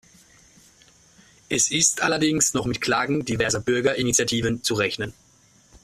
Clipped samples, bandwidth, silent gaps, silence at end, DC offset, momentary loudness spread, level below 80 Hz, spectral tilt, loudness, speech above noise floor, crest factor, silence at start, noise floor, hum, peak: under 0.1%; 15 kHz; none; 0.05 s; under 0.1%; 6 LU; -52 dBFS; -3 dB/octave; -22 LUFS; 34 dB; 18 dB; 1.5 s; -57 dBFS; none; -6 dBFS